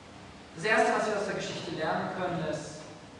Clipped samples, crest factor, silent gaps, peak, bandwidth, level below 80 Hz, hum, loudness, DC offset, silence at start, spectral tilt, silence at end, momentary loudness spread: under 0.1%; 20 dB; none; -12 dBFS; 11 kHz; -64 dBFS; none; -30 LUFS; under 0.1%; 0 s; -4.5 dB/octave; 0 s; 20 LU